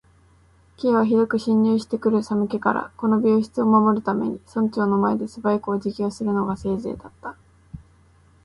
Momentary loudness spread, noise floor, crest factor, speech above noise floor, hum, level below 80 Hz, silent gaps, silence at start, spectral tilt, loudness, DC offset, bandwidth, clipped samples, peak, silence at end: 8 LU; -55 dBFS; 18 dB; 34 dB; none; -54 dBFS; none; 0.8 s; -8 dB/octave; -22 LUFS; under 0.1%; 11 kHz; under 0.1%; -4 dBFS; 0.7 s